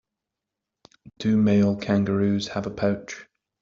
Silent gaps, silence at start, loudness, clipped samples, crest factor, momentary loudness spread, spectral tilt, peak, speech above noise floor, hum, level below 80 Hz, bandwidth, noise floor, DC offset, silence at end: none; 1.2 s; -23 LUFS; under 0.1%; 16 dB; 12 LU; -7 dB/octave; -8 dBFS; 63 dB; none; -58 dBFS; 7.4 kHz; -86 dBFS; under 0.1%; 0.4 s